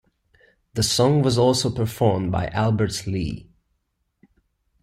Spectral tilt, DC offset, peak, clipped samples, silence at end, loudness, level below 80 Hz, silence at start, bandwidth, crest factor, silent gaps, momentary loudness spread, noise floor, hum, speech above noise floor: -5.5 dB/octave; under 0.1%; -6 dBFS; under 0.1%; 1.45 s; -21 LUFS; -46 dBFS; 0.75 s; 16 kHz; 18 dB; none; 10 LU; -73 dBFS; none; 53 dB